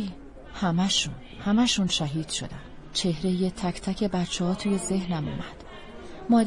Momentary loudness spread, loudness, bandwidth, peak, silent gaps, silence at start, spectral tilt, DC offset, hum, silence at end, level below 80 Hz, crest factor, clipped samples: 20 LU; -27 LUFS; 11.5 kHz; -10 dBFS; none; 0 s; -4.5 dB/octave; under 0.1%; none; 0 s; -46 dBFS; 16 dB; under 0.1%